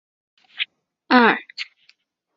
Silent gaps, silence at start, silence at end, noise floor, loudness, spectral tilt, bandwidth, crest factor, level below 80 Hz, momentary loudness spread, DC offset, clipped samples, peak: none; 0.6 s; 0.75 s; -61 dBFS; -19 LUFS; -5 dB/octave; 7.4 kHz; 22 dB; -72 dBFS; 18 LU; under 0.1%; under 0.1%; -2 dBFS